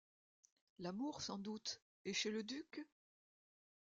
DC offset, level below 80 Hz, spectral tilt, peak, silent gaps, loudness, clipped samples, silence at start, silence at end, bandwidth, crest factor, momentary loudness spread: under 0.1%; -84 dBFS; -3 dB/octave; -28 dBFS; 1.82-2.05 s; -46 LUFS; under 0.1%; 0.8 s; 1.1 s; 9 kHz; 22 dB; 12 LU